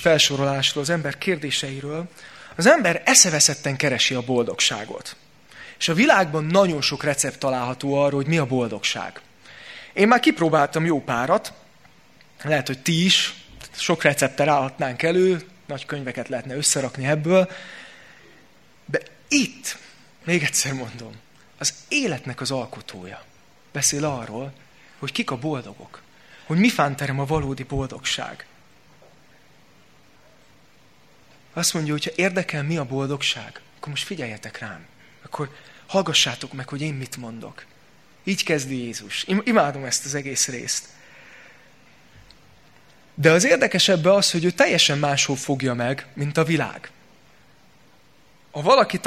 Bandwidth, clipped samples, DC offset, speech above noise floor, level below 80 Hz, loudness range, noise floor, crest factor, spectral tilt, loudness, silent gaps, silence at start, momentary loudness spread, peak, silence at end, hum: 16 kHz; under 0.1%; 0.2%; 34 dB; -56 dBFS; 9 LU; -56 dBFS; 24 dB; -3.5 dB/octave; -21 LUFS; none; 0 s; 19 LU; 0 dBFS; 0 s; none